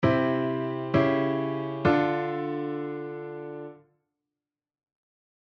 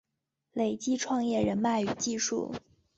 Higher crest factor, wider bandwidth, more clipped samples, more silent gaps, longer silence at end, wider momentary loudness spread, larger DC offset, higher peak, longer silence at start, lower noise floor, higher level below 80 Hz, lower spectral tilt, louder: about the same, 18 dB vs 16 dB; second, 6.4 kHz vs 8.2 kHz; neither; neither; first, 1.75 s vs 0.4 s; first, 14 LU vs 10 LU; neither; first, -10 dBFS vs -16 dBFS; second, 0 s vs 0.55 s; first, -90 dBFS vs -84 dBFS; about the same, -58 dBFS vs -62 dBFS; first, -9 dB/octave vs -4 dB/octave; first, -27 LUFS vs -30 LUFS